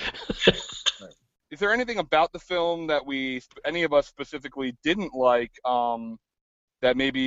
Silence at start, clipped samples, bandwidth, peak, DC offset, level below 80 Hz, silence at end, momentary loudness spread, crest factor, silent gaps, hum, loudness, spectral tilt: 0 s; under 0.1%; 8 kHz; -2 dBFS; under 0.1%; -52 dBFS; 0 s; 11 LU; 24 dB; 6.41-6.68 s; none; -25 LUFS; -4 dB/octave